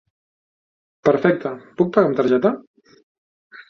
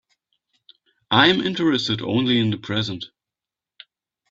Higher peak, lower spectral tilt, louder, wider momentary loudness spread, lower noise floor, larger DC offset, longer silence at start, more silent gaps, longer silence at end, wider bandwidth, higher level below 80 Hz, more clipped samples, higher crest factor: about the same, 0 dBFS vs 0 dBFS; first, -8 dB/octave vs -5.5 dB/octave; about the same, -19 LUFS vs -20 LUFS; second, 9 LU vs 12 LU; about the same, under -90 dBFS vs -89 dBFS; neither; about the same, 1.05 s vs 1.1 s; first, 2.67-2.74 s, 3.03-3.50 s vs none; second, 0.1 s vs 1.25 s; second, 6.6 kHz vs 7.8 kHz; about the same, -62 dBFS vs -60 dBFS; neither; about the same, 20 dB vs 22 dB